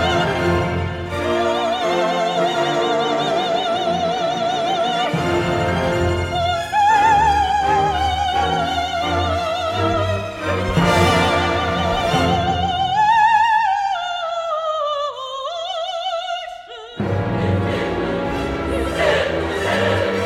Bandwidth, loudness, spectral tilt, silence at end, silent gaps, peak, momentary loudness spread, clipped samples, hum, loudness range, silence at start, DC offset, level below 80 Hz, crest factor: 16 kHz; -19 LUFS; -5 dB/octave; 0 s; none; -2 dBFS; 9 LU; under 0.1%; none; 6 LU; 0 s; under 0.1%; -36 dBFS; 16 dB